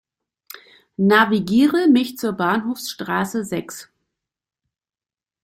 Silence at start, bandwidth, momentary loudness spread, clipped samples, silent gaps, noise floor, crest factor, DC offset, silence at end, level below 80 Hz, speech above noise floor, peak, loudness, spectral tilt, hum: 1 s; 16.5 kHz; 13 LU; under 0.1%; none; under -90 dBFS; 20 dB; under 0.1%; 1.6 s; -62 dBFS; over 72 dB; -2 dBFS; -19 LUFS; -5 dB/octave; none